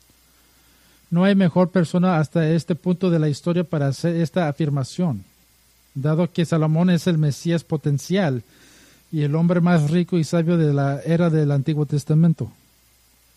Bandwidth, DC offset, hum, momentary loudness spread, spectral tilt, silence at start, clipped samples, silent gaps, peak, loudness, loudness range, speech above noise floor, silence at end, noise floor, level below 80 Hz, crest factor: 12 kHz; under 0.1%; none; 7 LU; -7.5 dB/octave; 1.1 s; under 0.1%; none; -6 dBFS; -20 LUFS; 3 LU; 38 dB; 0.85 s; -57 dBFS; -60 dBFS; 14 dB